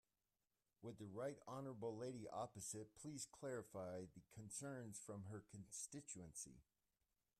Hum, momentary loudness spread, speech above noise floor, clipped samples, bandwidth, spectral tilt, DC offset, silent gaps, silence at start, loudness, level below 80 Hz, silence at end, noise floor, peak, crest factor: none; 7 LU; over 37 dB; under 0.1%; 14 kHz; -4.5 dB/octave; under 0.1%; none; 0.8 s; -53 LUFS; -82 dBFS; 0.75 s; under -90 dBFS; -38 dBFS; 16 dB